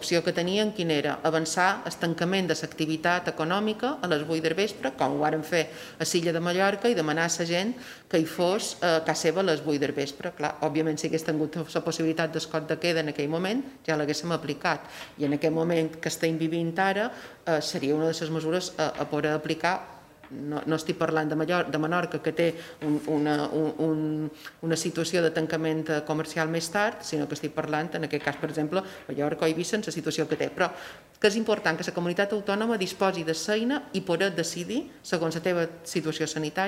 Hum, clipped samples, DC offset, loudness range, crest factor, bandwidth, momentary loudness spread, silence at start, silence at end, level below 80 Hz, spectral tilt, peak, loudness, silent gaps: none; under 0.1%; under 0.1%; 2 LU; 18 dB; 16 kHz; 6 LU; 0 s; 0 s; -66 dBFS; -4.5 dB/octave; -10 dBFS; -28 LUFS; none